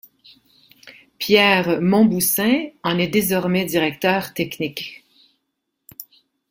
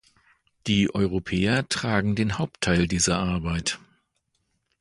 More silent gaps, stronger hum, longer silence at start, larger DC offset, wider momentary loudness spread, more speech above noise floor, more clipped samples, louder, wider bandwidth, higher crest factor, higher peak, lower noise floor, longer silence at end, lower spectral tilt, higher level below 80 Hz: neither; neither; first, 0.85 s vs 0.65 s; neither; first, 16 LU vs 5 LU; first, 58 dB vs 50 dB; neither; first, -18 LUFS vs -24 LUFS; first, 16.5 kHz vs 11.5 kHz; about the same, 20 dB vs 20 dB; first, -2 dBFS vs -6 dBFS; about the same, -76 dBFS vs -74 dBFS; second, 0.5 s vs 1.05 s; about the same, -4.5 dB/octave vs -4.5 dB/octave; second, -58 dBFS vs -42 dBFS